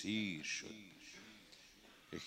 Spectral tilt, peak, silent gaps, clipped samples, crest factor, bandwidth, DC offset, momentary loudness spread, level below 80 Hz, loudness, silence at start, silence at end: -3 dB/octave; -28 dBFS; none; under 0.1%; 18 dB; 16 kHz; under 0.1%; 20 LU; -78 dBFS; -45 LUFS; 0 s; 0 s